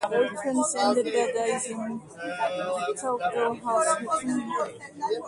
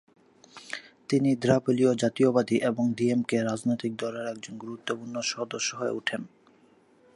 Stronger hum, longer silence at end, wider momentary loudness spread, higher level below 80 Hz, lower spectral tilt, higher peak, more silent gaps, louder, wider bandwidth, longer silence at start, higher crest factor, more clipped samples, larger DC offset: neither; second, 0 s vs 0.9 s; second, 10 LU vs 15 LU; about the same, -70 dBFS vs -68 dBFS; second, -3 dB/octave vs -5 dB/octave; about the same, -10 dBFS vs -8 dBFS; neither; about the same, -27 LUFS vs -27 LUFS; about the same, 11.5 kHz vs 11.5 kHz; second, 0 s vs 0.55 s; about the same, 16 dB vs 20 dB; neither; neither